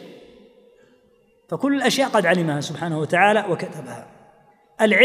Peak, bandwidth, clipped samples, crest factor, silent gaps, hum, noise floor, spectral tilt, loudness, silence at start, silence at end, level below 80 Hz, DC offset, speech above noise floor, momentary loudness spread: -2 dBFS; 15.5 kHz; under 0.1%; 20 dB; none; none; -59 dBFS; -4.5 dB/octave; -20 LUFS; 0 s; 0 s; -70 dBFS; under 0.1%; 38 dB; 16 LU